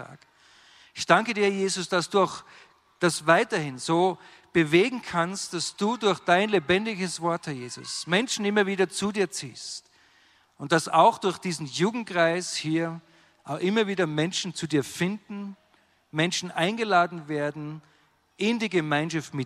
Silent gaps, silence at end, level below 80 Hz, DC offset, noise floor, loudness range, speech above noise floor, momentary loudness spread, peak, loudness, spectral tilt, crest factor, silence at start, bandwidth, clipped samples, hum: none; 0 s; -68 dBFS; under 0.1%; -64 dBFS; 3 LU; 38 dB; 14 LU; -4 dBFS; -25 LUFS; -4.5 dB/octave; 22 dB; 0 s; 14 kHz; under 0.1%; none